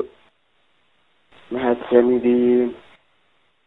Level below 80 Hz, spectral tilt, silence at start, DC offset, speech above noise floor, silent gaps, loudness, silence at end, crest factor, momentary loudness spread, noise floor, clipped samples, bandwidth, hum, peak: -58 dBFS; -9 dB/octave; 0 s; under 0.1%; 48 dB; none; -19 LUFS; 0.9 s; 20 dB; 13 LU; -65 dBFS; under 0.1%; 4 kHz; none; -2 dBFS